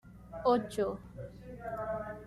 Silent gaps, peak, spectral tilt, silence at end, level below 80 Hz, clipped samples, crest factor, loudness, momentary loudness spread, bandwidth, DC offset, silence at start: none; -16 dBFS; -6.5 dB/octave; 0 s; -56 dBFS; under 0.1%; 18 dB; -34 LUFS; 17 LU; 13.5 kHz; under 0.1%; 0.05 s